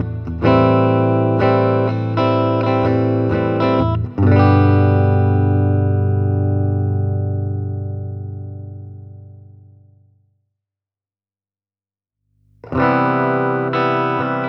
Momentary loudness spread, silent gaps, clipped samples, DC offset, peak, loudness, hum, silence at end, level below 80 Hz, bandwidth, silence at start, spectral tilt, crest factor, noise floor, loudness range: 14 LU; none; under 0.1%; under 0.1%; 0 dBFS; -16 LUFS; none; 0 s; -42 dBFS; 5.6 kHz; 0 s; -10 dB/octave; 16 dB; under -90 dBFS; 14 LU